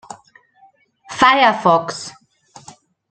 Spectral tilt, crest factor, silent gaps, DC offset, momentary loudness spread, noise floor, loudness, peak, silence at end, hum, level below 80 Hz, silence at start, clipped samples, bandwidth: -3.5 dB/octave; 18 dB; none; under 0.1%; 20 LU; -53 dBFS; -14 LUFS; -2 dBFS; 1 s; none; -60 dBFS; 1.1 s; under 0.1%; 9.2 kHz